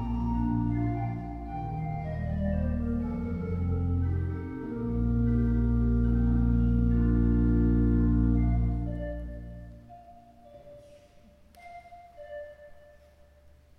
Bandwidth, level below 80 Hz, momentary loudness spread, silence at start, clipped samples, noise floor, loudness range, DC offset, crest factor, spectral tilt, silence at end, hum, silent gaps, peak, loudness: 3.1 kHz; -32 dBFS; 19 LU; 0 s; under 0.1%; -57 dBFS; 23 LU; under 0.1%; 14 dB; -11.5 dB/octave; 1 s; none; none; -14 dBFS; -28 LUFS